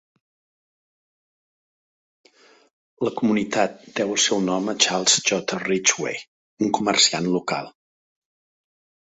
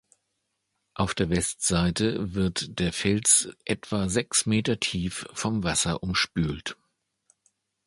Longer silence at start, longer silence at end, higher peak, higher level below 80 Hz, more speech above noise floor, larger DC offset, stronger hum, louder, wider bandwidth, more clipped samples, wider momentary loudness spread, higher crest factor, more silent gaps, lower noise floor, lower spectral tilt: first, 3 s vs 0.95 s; first, 1.4 s vs 1.15 s; first, -2 dBFS vs -6 dBFS; second, -66 dBFS vs -46 dBFS; first, over 68 dB vs 52 dB; neither; neither; first, -21 LUFS vs -25 LUFS; second, 8.4 kHz vs 11.5 kHz; neither; about the same, 11 LU vs 10 LU; about the same, 22 dB vs 22 dB; first, 6.28-6.57 s vs none; first, under -90 dBFS vs -78 dBFS; second, -2 dB/octave vs -3.5 dB/octave